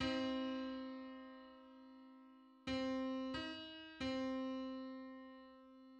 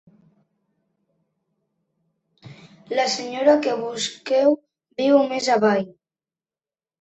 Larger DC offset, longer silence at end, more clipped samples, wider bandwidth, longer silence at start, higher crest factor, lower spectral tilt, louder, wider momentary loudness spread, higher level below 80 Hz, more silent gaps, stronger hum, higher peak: neither; second, 0 s vs 1.1 s; neither; about the same, 8.6 kHz vs 8.4 kHz; second, 0 s vs 2.45 s; about the same, 18 dB vs 20 dB; about the same, -5 dB/octave vs -4 dB/octave; second, -45 LUFS vs -21 LUFS; first, 19 LU vs 9 LU; about the same, -70 dBFS vs -70 dBFS; neither; neither; second, -28 dBFS vs -4 dBFS